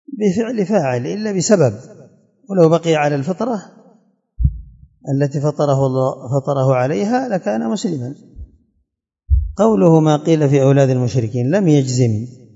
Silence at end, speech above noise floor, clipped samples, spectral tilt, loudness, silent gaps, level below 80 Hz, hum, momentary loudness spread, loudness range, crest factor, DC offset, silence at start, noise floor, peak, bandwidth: 0.25 s; 55 dB; under 0.1%; -7 dB/octave; -16 LUFS; none; -32 dBFS; none; 10 LU; 6 LU; 16 dB; under 0.1%; 0.1 s; -70 dBFS; 0 dBFS; 7.8 kHz